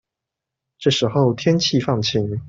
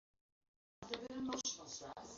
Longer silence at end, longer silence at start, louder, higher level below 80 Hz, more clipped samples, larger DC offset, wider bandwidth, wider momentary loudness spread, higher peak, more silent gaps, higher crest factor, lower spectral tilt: about the same, 0 s vs 0 s; about the same, 0.8 s vs 0.8 s; first, -19 LUFS vs -45 LUFS; first, -54 dBFS vs -74 dBFS; neither; neither; about the same, 8 kHz vs 7.6 kHz; second, 3 LU vs 8 LU; first, -4 dBFS vs -26 dBFS; neither; second, 16 dB vs 22 dB; first, -5.5 dB/octave vs -2.5 dB/octave